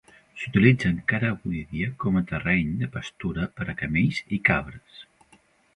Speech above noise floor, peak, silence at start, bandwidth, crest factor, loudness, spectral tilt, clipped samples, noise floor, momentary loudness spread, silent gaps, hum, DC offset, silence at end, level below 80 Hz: 35 dB; -4 dBFS; 0.35 s; 10.5 kHz; 22 dB; -25 LUFS; -7.5 dB/octave; under 0.1%; -60 dBFS; 12 LU; none; none; under 0.1%; 0.7 s; -46 dBFS